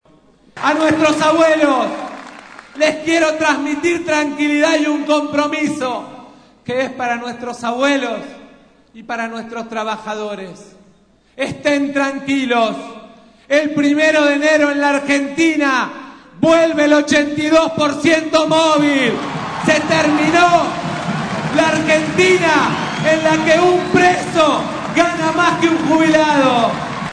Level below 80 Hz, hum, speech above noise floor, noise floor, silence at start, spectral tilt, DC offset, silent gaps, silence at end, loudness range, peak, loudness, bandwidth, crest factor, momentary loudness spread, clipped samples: -52 dBFS; none; 37 dB; -51 dBFS; 0.55 s; -4.5 dB/octave; under 0.1%; none; 0 s; 8 LU; -2 dBFS; -15 LUFS; 10.5 kHz; 14 dB; 12 LU; under 0.1%